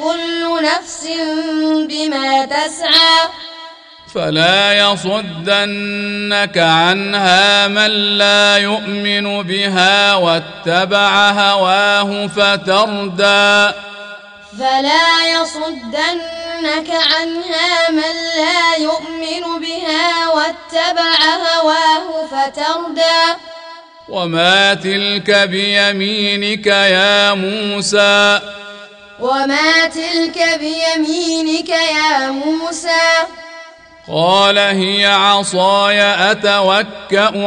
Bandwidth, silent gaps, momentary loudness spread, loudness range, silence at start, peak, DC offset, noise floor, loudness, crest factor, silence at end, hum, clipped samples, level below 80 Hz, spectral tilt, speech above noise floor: 10.5 kHz; none; 11 LU; 4 LU; 0 s; 0 dBFS; under 0.1%; -38 dBFS; -12 LUFS; 14 dB; 0 s; none; under 0.1%; -54 dBFS; -3 dB/octave; 24 dB